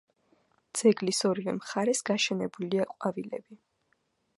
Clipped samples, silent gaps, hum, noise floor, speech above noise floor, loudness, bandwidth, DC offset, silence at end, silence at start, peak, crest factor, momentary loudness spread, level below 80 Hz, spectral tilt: under 0.1%; none; none; -74 dBFS; 45 dB; -29 LUFS; 11.5 kHz; under 0.1%; 0.85 s; 0.75 s; -10 dBFS; 20 dB; 11 LU; -76 dBFS; -4 dB/octave